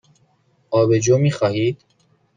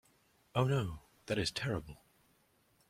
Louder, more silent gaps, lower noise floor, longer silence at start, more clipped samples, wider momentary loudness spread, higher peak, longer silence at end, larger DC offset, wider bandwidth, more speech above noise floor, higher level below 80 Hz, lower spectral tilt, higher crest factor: first, -18 LUFS vs -36 LUFS; neither; second, -61 dBFS vs -72 dBFS; first, 0.7 s vs 0.55 s; neither; second, 8 LU vs 14 LU; first, -4 dBFS vs -16 dBFS; second, 0.6 s vs 0.95 s; neither; second, 9.4 kHz vs 15.5 kHz; first, 44 dB vs 37 dB; about the same, -58 dBFS vs -60 dBFS; about the same, -6 dB/octave vs -5.5 dB/octave; second, 16 dB vs 22 dB